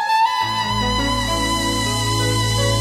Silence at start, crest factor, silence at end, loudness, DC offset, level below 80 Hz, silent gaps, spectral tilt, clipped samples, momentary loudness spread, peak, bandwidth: 0 s; 12 dB; 0 s; -18 LUFS; under 0.1%; -32 dBFS; none; -3.5 dB/octave; under 0.1%; 2 LU; -6 dBFS; 16 kHz